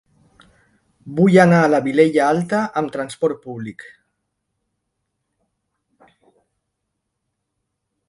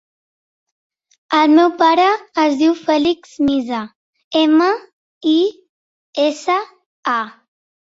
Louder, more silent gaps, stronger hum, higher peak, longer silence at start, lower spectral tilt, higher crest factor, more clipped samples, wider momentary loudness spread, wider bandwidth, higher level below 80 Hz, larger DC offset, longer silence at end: about the same, -16 LUFS vs -16 LUFS; second, none vs 3.95-4.13 s, 4.24-4.31 s, 4.93-5.21 s, 5.69-6.13 s, 6.86-7.03 s; neither; about the same, 0 dBFS vs -2 dBFS; second, 1.05 s vs 1.3 s; first, -7 dB/octave vs -4 dB/octave; about the same, 20 dB vs 16 dB; neither; first, 18 LU vs 13 LU; first, 11.5 kHz vs 7.8 kHz; about the same, -62 dBFS vs -60 dBFS; neither; first, 4.35 s vs 0.6 s